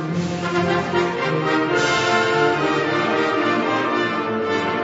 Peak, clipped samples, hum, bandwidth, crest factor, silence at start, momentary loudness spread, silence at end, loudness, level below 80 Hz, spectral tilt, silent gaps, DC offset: -6 dBFS; under 0.1%; none; 8 kHz; 14 dB; 0 s; 4 LU; 0 s; -19 LUFS; -54 dBFS; -5 dB/octave; none; under 0.1%